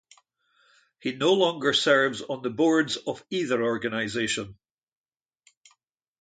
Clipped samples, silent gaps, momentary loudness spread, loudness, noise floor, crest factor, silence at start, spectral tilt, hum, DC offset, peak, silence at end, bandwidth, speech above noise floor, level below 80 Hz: under 0.1%; none; 10 LU; -25 LUFS; under -90 dBFS; 20 dB; 1.05 s; -3.5 dB/octave; none; under 0.1%; -6 dBFS; 1.65 s; 9.4 kHz; over 65 dB; -68 dBFS